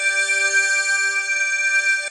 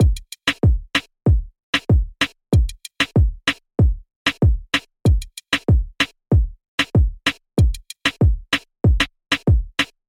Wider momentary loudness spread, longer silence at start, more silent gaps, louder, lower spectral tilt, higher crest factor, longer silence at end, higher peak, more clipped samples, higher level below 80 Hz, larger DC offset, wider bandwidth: about the same, 3 LU vs 5 LU; about the same, 0 s vs 0 s; second, none vs 1.63-1.73 s, 4.16-4.25 s, 6.68-6.78 s; first, -17 LUFS vs -20 LUFS; second, 5.5 dB/octave vs -5.5 dB/octave; about the same, 12 dB vs 14 dB; second, 0 s vs 0.25 s; second, -8 dBFS vs -4 dBFS; neither; second, under -90 dBFS vs -22 dBFS; neither; second, 11 kHz vs 14.5 kHz